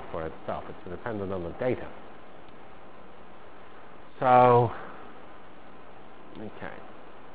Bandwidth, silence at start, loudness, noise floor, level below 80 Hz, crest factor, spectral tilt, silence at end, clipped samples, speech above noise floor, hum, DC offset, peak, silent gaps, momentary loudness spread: 4 kHz; 0 s; -26 LUFS; -50 dBFS; -56 dBFS; 24 dB; -6 dB/octave; 0.15 s; under 0.1%; 23 dB; none; 1%; -6 dBFS; none; 28 LU